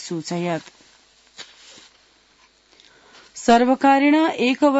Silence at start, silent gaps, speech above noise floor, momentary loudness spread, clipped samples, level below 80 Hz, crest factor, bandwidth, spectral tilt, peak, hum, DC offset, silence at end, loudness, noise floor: 0 s; none; 39 dB; 25 LU; under 0.1%; -60 dBFS; 16 dB; 8 kHz; -5 dB/octave; -4 dBFS; none; under 0.1%; 0 s; -18 LUFS; -57 dBFS